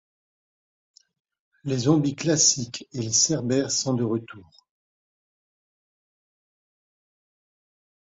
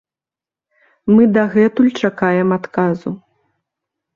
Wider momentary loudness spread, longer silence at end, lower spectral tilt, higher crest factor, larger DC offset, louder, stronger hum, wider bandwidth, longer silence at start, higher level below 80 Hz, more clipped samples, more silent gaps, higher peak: about the same, 12 LU vs 14 LU; first, 3.65 s vs 1 s; second, -3.5 dB/octave vs -8 dB/octave; first, 22 dB vs 14 dB; neither; second, -23 LUFS vs -15 LUFS; neither; first, 8.2 kHz vs 7.2 kHz; first, 1.65 s vs 1.05 s; second, -64 dBFS vs -56 dBFS; neither; neither; second, -6 dBFS vs -2 dBFS